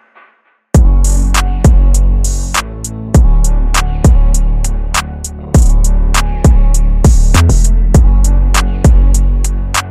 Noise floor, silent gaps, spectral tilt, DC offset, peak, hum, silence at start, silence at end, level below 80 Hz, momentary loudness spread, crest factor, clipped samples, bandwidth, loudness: -51 dBFS; none; -5 dB/octave; under 0.1%; 0 dBFS; none; 0.75 s; 0 s; -8 dBFS; 7 LU; 8 dB; under 0.1%; 14 kHz; -12 LUFS